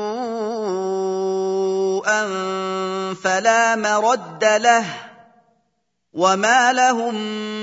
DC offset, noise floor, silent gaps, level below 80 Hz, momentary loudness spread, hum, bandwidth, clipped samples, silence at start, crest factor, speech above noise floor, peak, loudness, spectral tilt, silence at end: under 0.1%; -73 dBFS; none; -76 dBFS; 10 LU; none; 8 kHz; under 0.1%; 0 s; 18 dB; 54 dB; -2 dBFS; -19 LUFS; -3 dB/octave; 0 s